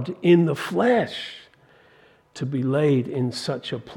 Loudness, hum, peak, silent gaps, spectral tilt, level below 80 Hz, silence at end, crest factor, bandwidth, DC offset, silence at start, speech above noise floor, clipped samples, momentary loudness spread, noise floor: -22 LUFS; none; -6 dBFS; none; -7 dB/octave; -68 dBFS; 0 s; 18 dB; 17.5 kHz; under 0.1%; 0 s; 33 dB; under 0.1%; 15 LU; -56 dBFS